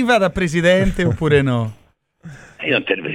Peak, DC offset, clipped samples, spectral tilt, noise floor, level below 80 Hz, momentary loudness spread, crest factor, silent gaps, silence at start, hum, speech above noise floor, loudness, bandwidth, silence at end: -2 dBFS; under 0.1%; under 0.1%; -6 dB/octave; -42 dBFS; -34 dBFS; 8 LU; 16 dB; none; 0 s; none; 26 dB; -17 LUFS; 15 kHz; 0 s